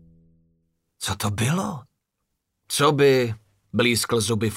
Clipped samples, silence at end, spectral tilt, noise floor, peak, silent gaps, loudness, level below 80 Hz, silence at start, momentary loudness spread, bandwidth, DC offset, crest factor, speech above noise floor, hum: under 0.1%; 0 s; -4.5 dB/octave; -78 dBFS; -4 dBFS; none; -22 LUFS; -56 dBFS; 1 s; 14 LU; 16 kHz; under 0.1%; 20 dB; 57 dB; none